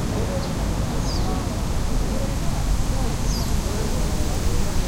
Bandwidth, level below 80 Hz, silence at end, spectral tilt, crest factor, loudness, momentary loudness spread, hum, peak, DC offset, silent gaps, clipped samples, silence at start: 16 kHz; -24 dBFS; 0 s; -5 dB/octave; 14 dB; -25 LUFS; 1 LU; none; -8 dBFS; under 0.1%; none; under 0.1%; 0 s